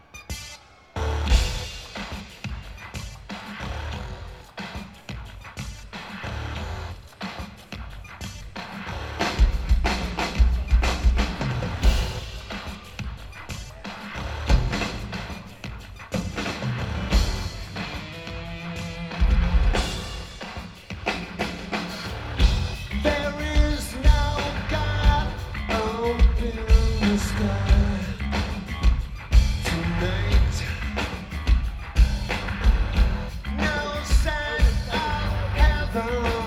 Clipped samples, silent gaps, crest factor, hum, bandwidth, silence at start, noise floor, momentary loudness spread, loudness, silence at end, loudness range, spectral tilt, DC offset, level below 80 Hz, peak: under 0.1%; none; 20 dB; none; 13 kHz; 0.15 s; -45 dBFS; 15 LU; -26 LUFS; 0 s; 12 LU; -5.5 dB/octave; under 0.1%; -26 dBFS; -4 dBFS